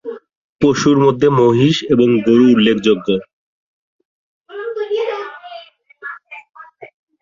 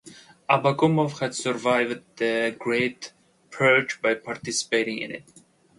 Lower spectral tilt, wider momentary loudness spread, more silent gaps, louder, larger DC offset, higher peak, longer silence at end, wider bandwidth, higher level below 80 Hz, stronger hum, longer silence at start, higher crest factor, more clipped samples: first, -6.5 dB/octave vs -4.5 dB/octave; first, 22 LU vs 16 LU; first, 0.37-0.59 s, 3.33-3.99 s, 4.05-4.41 s vs none; first, -14 LUFS vs -24 LUFS; neither; first, -2 dBFS vs -6 dBFS; second, 0.35 s vs 0.55 s; second, 7.6 kHz vs 11.5 kHz; first, -52 dBFS vs -68 dBFS; neither; about the same, 0.05 s vs 0.05 s; second, 14 dB vs 20 dB; neither